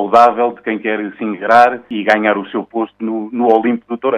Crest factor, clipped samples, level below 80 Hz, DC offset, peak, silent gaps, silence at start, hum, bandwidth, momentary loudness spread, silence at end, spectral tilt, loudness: 14 dB; 0.3%; -58 dBFS; under 0.1%; 0 dBFS; none; 0 s; none; 9.8 kHz; 11 LU; 0 s; -6 dB/octave; -15 LUFS